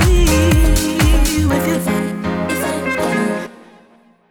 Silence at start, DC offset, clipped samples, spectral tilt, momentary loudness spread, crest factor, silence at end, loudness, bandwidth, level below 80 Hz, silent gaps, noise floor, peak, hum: 0 s; under 0.1%; under 0.1%; -5 dB/octave; 8 LU; 12 dB; 0.75 s; -16 LUFS; 19.5 kHz; -20 dBFS; none; -50 dBFS; -2 dBFS; none